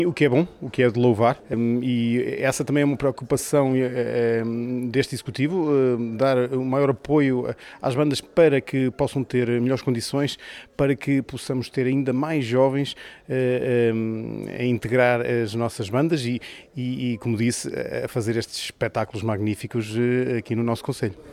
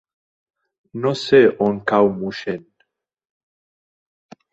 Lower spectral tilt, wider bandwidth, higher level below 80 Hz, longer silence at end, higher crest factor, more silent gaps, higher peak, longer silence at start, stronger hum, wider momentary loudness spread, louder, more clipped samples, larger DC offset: about the same, -6 dB/octave vs -6.5 dB/octave; first, 15.5 kHz vs 8 kHz; about the same, -56 dBFS vs -60 dBFS; second, 0 s vs 1.95 s; about the same, 16 dB vs 20 dB; neither; second, -6 dBFS vs -2 dBFS; second, 0 s vs 0.95 s; neither; second, 8 LU vs 15 LU; second, -23 LUFS vs -18 LUFS; neither; neither